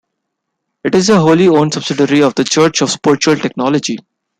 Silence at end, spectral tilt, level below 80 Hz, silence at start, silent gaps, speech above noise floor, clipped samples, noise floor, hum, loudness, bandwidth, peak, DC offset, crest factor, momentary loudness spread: 0.45 s; -4.5 dB/octave; -54 dBFS; 0.85 s; none; 62 dB; under 0.1%; -74 dBFS; none; -12 LUFS; 11 kHz; 0 dBFS; under 0.1%; 12 dB; 7 LU